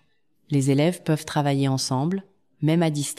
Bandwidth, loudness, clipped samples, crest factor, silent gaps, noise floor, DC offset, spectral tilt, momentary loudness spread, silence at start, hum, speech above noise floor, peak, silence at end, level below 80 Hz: 14.5 kHz; -23 LUFS; under 0.1%; 14 dB; none; -67 dBFS; under 0.1%; -6 dB/octave; 6 LU; 0.5 s; none; 45 dB; -8 dBFS; 0.05 s; -66 dBFS